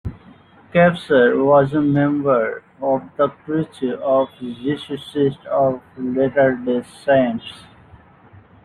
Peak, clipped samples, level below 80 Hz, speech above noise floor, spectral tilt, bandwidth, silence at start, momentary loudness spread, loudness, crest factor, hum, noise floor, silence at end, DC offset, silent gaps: -2 dBFS; under 0.1%; -52 dBFS; 29 dB; -8 dB/octave; 11 kHz; 0.05 s; 11 LU; -19 LUFS; 16 dB; none; -47 dBFS; 1.05 s; under 0.1%; none